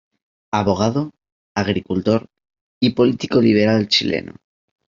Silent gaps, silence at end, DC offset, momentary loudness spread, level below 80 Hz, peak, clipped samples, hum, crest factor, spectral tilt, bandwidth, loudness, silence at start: 1.32-1.55 s, 2.61-2.81 s; 0.65 s; under 0.1%; 10 LU; -54 dBFS; -2 dBFS; under 0.1%; none; 16 dB; -6 dB/octave; 7.6 kHz; -18 LUFS; 0.55 s